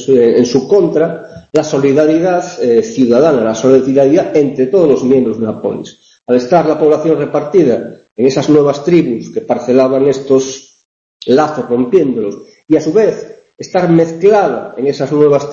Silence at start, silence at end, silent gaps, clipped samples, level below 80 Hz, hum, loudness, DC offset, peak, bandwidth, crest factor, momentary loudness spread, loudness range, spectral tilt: 0 s; 0 s; 8.12-8.16 s, 10.85-11.20 s; under 0.1%; -52 dBFS; none; -11 LUFS; under 0.1%; 0 dBFS; 7.4 kHz; 12 dB; 9 LU; 3 LU; -6.5 dB/octave